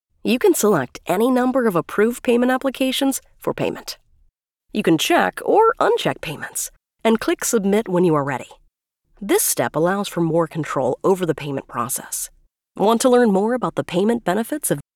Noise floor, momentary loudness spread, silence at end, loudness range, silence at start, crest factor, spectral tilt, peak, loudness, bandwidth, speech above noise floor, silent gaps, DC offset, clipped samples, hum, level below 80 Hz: -64 dBFS; 11 LU; 0.15 s; 3 LU; 0.25 s; 16 dB; -4.5 dB/octave; -4 dBFS; -19 LUFS; 19.5 kHz; 45 dB; none; under 0.1%; under 0.1%; none; -54 dBFS